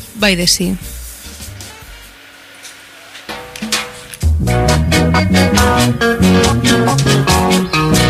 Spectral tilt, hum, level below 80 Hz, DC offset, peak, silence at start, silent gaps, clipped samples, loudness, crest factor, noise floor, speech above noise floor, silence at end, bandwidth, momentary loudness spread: -4.5 dB/octave; none; -26 dBFS; under 0.1%; 0 dBFS; 0 s; none; under 0.1%; -12 LUFS; 14 dB; -38 dBFS; 26 dB; 0 s; 16 kHz; 20 LU